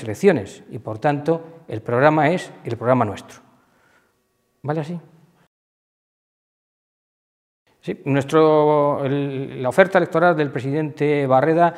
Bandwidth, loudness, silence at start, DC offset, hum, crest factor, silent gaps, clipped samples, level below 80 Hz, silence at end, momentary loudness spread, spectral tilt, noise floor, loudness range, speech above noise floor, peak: 14 kHz; -19 LUFS; 0 s; under 0.1%; none; 20 dB; 5.47-7.66 s; under 0.1%; -66 dBFS; 0 s; 16 LU; -7 dB/octave; -67 dBFS; 16 LU; 48 dB; 0 dBFS